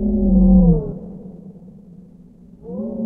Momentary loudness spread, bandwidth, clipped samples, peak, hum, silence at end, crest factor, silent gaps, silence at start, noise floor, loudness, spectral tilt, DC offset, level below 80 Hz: 25 LU; 1.2 kHz; under 0.1%; -2 dBFS; none; 0 s; 16 dB; none; 0 s; -44 dBFS; -15 LUFS; -15.5 dB/octave; under 0.1%; -26 dBFS